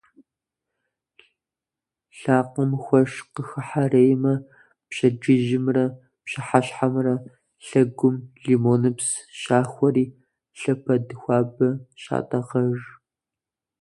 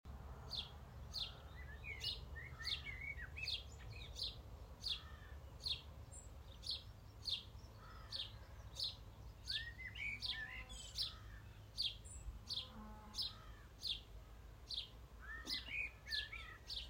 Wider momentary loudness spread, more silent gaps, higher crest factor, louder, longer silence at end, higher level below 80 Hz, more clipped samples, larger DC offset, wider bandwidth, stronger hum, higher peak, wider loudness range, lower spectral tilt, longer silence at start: about the same, 12 LU vs 14 LU; neither; about the same, 22 dB vs 20 dB; first, -23 LUFS vs -47 LUFS; first, 0.95 s vs 0 s; second, -64 dBFS vs -58 dBFS; neither; neither; second, 11.5 kHz vs 16 kHz; neither; first, 0 dBFS vs -30 dBFS; about the same, 4 LU vs 2 LU; first, -6.5 dB/octave vs -2.5 dB/octave; first, 2.15 s vs 0.05 s